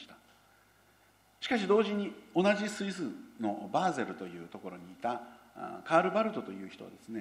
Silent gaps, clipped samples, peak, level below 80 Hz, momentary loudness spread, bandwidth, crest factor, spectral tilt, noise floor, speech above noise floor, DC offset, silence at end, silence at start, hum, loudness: none; under 0.1%; -10 dBFS; -76 dBFS; 18 LU; 15 kHz; 24 dB; -5.5 dB/octave; -65 dBFS; 32 dB; under 0.1%; 0 s; 0 s; none; -33 LUFS